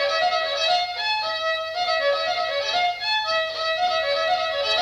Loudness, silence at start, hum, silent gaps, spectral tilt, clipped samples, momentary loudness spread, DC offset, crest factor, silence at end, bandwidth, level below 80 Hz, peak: -22 LUFS; 0 s; none; none; 0 dB/octave; under 0.1%; 3 LU; under 0.1%; 12 dB; 0 s; 15.5 kHz; -62 dBFS; -10 dBFS